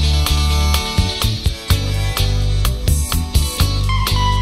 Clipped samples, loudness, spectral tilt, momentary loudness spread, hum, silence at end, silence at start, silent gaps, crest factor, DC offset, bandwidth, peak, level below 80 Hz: under 0.1%; -17 LUFS; -4 dB/octave; 3 LU; none; 0 s; 0 s; none; 14 dB; 0.2%; 16.5 kHz; -2 dBFS; -18 dBFS